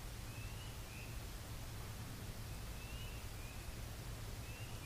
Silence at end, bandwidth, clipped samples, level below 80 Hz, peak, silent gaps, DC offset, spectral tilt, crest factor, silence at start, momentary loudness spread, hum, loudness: 0 s; 15.5 kHz; under 0.1%; -52 dBFS; -36 dBFS; none; under 0.1%; -4 dB/octave; 12 dB; 0 s; 1 LU; none; -49 LUFS